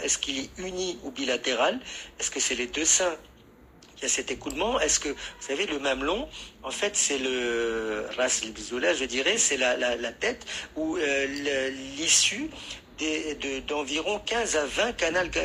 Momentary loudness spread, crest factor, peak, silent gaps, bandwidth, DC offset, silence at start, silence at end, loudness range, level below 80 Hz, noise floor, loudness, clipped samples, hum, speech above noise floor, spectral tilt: 11 LU; 20 dB; -8 dBFS; none; 15.5 kHz; under 0.1%; 0 s; 0 s; 3 LU; -52 dBFS; -53 dBFS; -26 LUFS; under 0.1%; none; 25 dB; -1 dB/octave